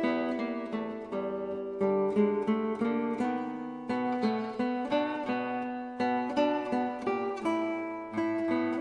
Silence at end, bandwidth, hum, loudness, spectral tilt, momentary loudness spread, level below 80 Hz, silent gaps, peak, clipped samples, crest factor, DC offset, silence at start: 0 s; 10 kHz; none; -31 LUFS; -7 dB/octave; 8 LU; -68 dBFS; none; -14 dBFS; under 0.1%; 16 dB; under 0.1%; 0 s